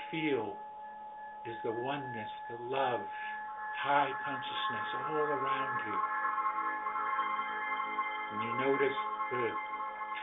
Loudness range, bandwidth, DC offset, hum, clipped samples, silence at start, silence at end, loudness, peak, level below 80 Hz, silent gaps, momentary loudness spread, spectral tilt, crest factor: 4 LU; 4 kHz; under 0.1%; none; under 0.1%; 0 s; 0 s; -35 LUFS; -18 dBFS; -76 dBFS; none; 11 LU; -2 dB/octave; 18 dB